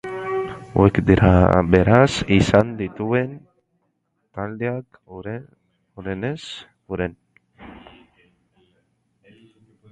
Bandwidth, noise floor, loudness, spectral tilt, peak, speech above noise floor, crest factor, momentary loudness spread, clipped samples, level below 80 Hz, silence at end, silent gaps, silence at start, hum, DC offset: 9.2 kHz; -71 dBFS; -19 LUFS; -7 dB/octave; 0 dBFS; 53 dB; 22 dB; 20 LU; under 0.1%; -36 dBFS; 2.15 s; none; 0.05 s; none; under 0.1%